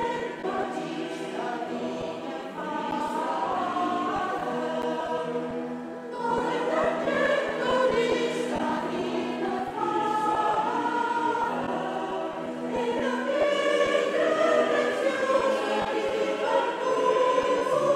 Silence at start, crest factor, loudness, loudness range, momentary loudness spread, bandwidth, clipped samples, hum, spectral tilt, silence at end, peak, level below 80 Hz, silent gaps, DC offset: 0 s; 16 dB; -27 LUFS; 5 LU; 9 LU; 13.5 kHz; under 0.1%; none; -4.5 dB/octave; 0 s; -10 dBFS; -62 dBFS; none; under 0.1%